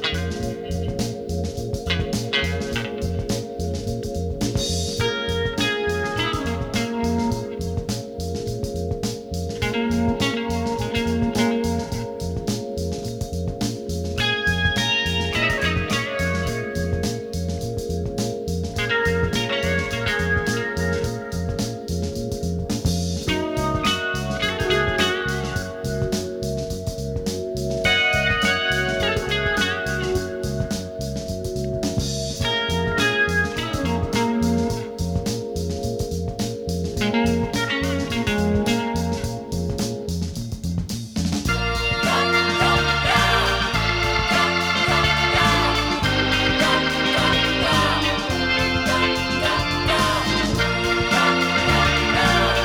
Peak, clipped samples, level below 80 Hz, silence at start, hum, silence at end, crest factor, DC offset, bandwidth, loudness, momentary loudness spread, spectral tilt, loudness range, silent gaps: -6 dBFS; under 0.1%; -34 dBFS; 0 s; none; 0 s; 16 dB; under 0.1%; 19.5 kHz; -22 LUFS; 10 LU; -4.5 dB/octave; 7 LU; none